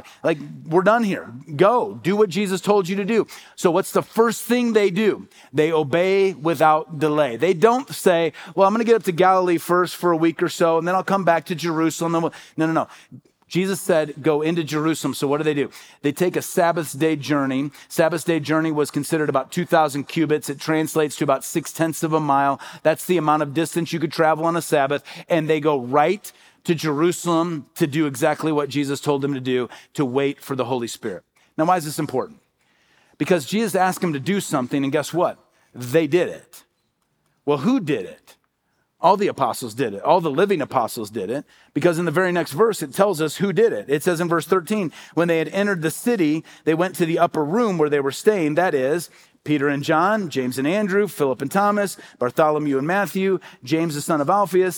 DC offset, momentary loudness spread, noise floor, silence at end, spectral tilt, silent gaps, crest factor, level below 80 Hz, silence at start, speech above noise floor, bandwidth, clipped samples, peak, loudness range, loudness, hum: under 0.1%; 8 LU; -70 dBFS; 0 s; -5.5 dB/octave; none; 20 dB; -72 dBFS; 0.05 s; 49 dB; over 20 kHz; under 0.1%; -2 dBFS; 5 LU; -21 LUFS; none